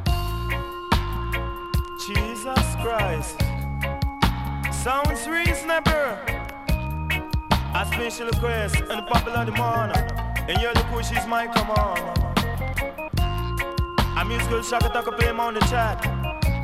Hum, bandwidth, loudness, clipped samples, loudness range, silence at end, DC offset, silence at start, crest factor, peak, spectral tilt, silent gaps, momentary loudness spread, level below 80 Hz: none; 16.5 kHz; -24 LUFS; under 0.1%; 2 LU; 0 s; under 0.1%; 0 s; 20 dB; -4 dBFS; -5 dB/octave; none; 6 LU; -30 dBFS